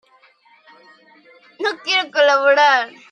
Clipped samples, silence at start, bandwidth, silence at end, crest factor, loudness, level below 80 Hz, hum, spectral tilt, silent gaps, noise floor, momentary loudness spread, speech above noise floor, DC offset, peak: under 0.1%; 1.6 s; 9.4 kHz; 0.25 s; 18 dB; -16 LUFS; -84 dBFS; none; 0 dB/octave; none; -54 dBFS; 11 LU; 38 dB; under 0.1%; -2 dBFS